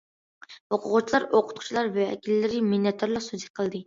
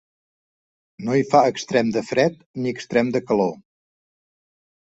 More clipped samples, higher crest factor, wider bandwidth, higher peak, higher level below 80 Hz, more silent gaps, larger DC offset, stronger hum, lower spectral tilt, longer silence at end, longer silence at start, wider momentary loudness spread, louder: neither; about the same, 18 dB vs 20 dB; about the same, 7.8 kHz vs 8.2 kHz; second, -8 dBFS vs -2 dBFS; about the same, -66 dBFS vs -62 dBFS; first, 0.60-0.70 s, 3.50-3.54 s vs 2.46-2.54 s; neither; neither; about the same, -5.5 dB/octave vs -6 dB/octave; second, 0.05 s vs 1.3 s; second, 0.5 s vs 1 s; about the same, 8 LU vs 10 LU; second, -26 LUFS vs -21 LUFS